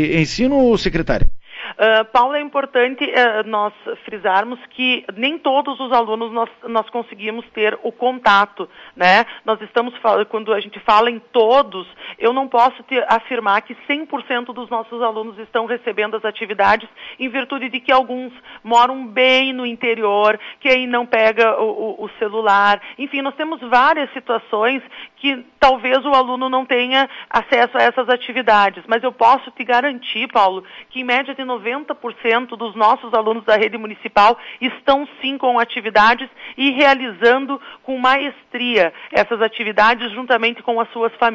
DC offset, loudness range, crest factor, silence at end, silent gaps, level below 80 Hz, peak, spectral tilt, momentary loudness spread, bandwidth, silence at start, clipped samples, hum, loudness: under 0.1%; 4 LU; 14 dB; 0 s; none; -38 dBFS; -2 dBFS; -4.5 dB/octave; 11 LU; 7.8 kHz; 0 s; under 0.1%; none; -17 LUFS